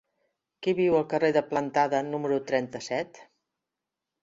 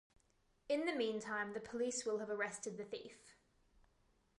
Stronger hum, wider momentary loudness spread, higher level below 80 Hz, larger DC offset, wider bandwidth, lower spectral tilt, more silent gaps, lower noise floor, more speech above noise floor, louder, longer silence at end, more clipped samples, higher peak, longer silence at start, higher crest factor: neither; about the same, 8 LU vs 10 LU; first, -68 dBFS vs -78 dBFS; neither; second, 7.8 kHz vs 11.5 kHz; first, -6 dB/octave vs -3 dB/octave; neither; first, -87 dBFS vs -77 dBFS; first, 61 dB vs 35 dB; first, -27 LUFS vs -42 LUFS; about the same, 1 s vs 1.05 s; neither; first, -8 dBFS vs -26 dBFS; about the same, 0.6 s vs 0.7 s; about the same, 20 dB vs 18 dB